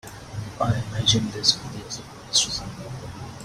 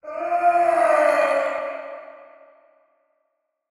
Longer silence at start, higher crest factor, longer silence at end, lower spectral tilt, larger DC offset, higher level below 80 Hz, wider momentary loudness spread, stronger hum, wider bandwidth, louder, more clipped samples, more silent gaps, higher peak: about the same, 0.05 s vs 0.05 s; first, 22 dB vs 16 dB; second, 0 s vs 1.45 s; about the same, -3 dB/octave vs -3 dB/octave; neither; first, -48 dBFS vs -76 dBFS; about the same, 16 LU vs 17 LU; neither; first, 15.5 kHz vs 12 kHz; about the same, -22 LUFS vs -20 LUFS; neither; neither; about the same, -4 dBFS vs -6 dBFS